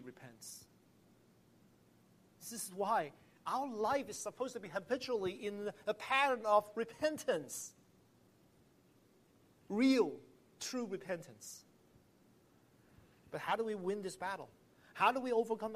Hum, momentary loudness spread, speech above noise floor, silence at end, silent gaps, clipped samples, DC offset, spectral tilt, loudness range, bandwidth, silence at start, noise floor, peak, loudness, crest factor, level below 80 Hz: none; 19 LU; 32 dB; 0 s; none; under 0.1%; under 0.1%; -3.5 dB/octave; 8 LU; 15 kHz; 0 s; -69 dBFS; -16 dBFS; -38 LUFS; 24 dB; -80 dBFS